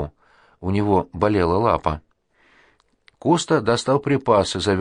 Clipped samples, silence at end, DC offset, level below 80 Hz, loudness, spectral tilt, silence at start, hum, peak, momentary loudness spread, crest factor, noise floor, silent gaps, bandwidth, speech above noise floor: under 0.1%; 0 s; under 0.1%; -44 dBFS; -20 LUFS; -5.5 dB/octave; 0 s; none; -4 dBFS; 9 LU; 18 dB; -60 dBFS; none; 10.5 kHz; 41 dB